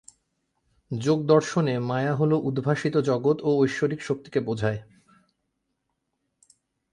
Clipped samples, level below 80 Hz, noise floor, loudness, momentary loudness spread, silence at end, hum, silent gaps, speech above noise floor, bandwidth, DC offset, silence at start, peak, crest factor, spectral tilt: under 0.1%; -62 dBFS; -78 dBFS; -25 LUFS; 8 LU; 2.1 s; none; none; 54 dB; 11 kHz; under 0.1%; 0.9 s; -6 dBFS; 20 dB; -7 dB/octave